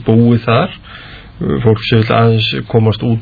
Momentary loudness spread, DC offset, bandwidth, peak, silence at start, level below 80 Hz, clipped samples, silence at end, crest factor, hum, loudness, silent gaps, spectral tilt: 15 LU; under 0.1%; 4.9 kHz; 0 dBFS; 0 s; -38 dBFS; 0.1%; 0 s; 12 dB; none; -12 LUFS; none; -9.5 dB/octave